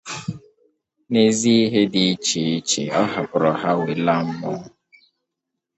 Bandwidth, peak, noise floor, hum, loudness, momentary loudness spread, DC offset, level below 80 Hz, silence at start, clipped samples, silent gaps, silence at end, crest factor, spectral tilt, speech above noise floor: 8.8 kHz; -2 dBFS; -81 dBFS; none; -20 LUFS; 14 LU; under 0.1%; -60 dBFS; 0.05 s; under 0.1%; none; 1.1 s; 18 dB; -4.5 dB/octave; 62 dB